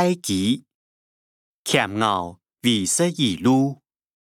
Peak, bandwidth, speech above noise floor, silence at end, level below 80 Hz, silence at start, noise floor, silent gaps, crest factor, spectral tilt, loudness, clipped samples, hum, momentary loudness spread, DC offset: -4 dBFS; 17 kHz; over 69 dB; 0.55 s; -66 dBFS; 0 s; under -90 dBFS; 0.74-1.64 s; 20 dB; -4 dB/octave; -21 LUFS; under 0.1%; none; 9 LU; under 0.1%